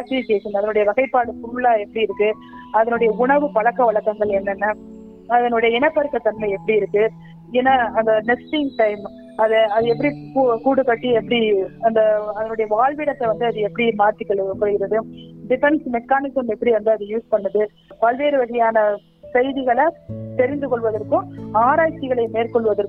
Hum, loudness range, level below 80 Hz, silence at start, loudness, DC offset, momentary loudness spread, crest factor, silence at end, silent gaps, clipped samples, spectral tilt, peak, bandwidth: none; 2 LU; -54 dBFS; 0 s; -19 LUFS; under 0.1%; 6 LU; 16 dB; 0 s; none; under 0.1%; -8 dB/octave; -4 dBFS; 4.6 kHz